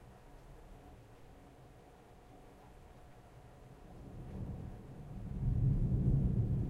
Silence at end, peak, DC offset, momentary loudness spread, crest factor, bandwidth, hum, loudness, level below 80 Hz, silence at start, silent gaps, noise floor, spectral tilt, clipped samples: 0 s; -20 dBFS; under 0.1%; 26 LU; 18 dB; 6.8 kHz; none; -37 LUFS; -44 dBFS; 0 s; none; -59 dBFS; -10 dB/octave; under 0.1%